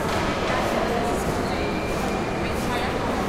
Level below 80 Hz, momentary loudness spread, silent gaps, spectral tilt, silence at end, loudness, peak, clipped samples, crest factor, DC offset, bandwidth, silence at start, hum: -36 dBFS; 2 LU; none; -5 dB/octave; 0 s; -24 LUFS; -12 dBFS; under 0.1%; 12 dB; under 0.1%; 16 kHz; 0 s; none